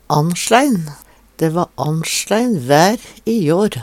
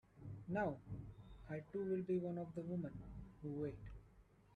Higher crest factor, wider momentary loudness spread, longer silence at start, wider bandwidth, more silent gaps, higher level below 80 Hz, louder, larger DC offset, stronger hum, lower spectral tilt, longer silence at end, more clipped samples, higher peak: about the same, 16 dB vs 18 dB; second, 8 LU vs 15 LU; about the same, 0.1 s vs 0.15 s; first, 18 kHz vs 6.6 kHz; neither; first, -52 dBFS vs -64 dBFS; first, -16 LUFS vs -46 LUFS; neither; neither; second, -5 dB/octave vs -10 dB/octave; about the same, 0 s vs 0 s; neither; first, 0 dBFS vs -30 dBFS